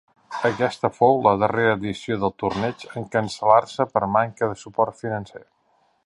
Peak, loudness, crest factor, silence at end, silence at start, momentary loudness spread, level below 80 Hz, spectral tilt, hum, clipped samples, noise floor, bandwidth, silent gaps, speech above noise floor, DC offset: -2 dBFS; -22 LUFS; 20 dB; 0.7 s; 0.3 s; 11 LU; -56 dBFS; -6 dB/octave; none; under 0.1%; -64 dBFS; 11.5 kHz; none; 43 dB; under 0.1%